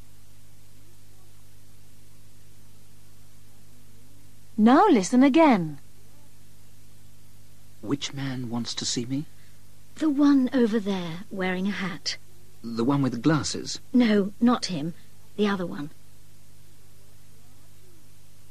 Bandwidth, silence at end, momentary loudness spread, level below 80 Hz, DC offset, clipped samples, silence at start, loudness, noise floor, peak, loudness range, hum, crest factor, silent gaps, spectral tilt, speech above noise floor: 14 kHz; 2.65 s; 17 LU; -60 dBFS; 1%; under 0.1%; 4.55 s; -24 LUFS; -55 dBFS; -8 dBFS; 11 LU; 50 Hz at -55 dBFS; 20 dB; none; -5.5 dB/octave; 32 dB